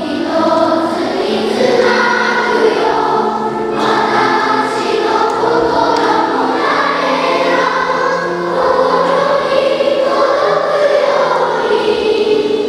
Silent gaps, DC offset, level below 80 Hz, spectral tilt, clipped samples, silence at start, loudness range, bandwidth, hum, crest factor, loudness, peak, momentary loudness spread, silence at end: none; under 0.1%; -50 dBFS; -4.5 dB/octave; under 0.1%; 0 s; 1 LU; 13 kHz; none; 12 dB; -13 LUFS; 0 dBFS; 3 LU; 0 s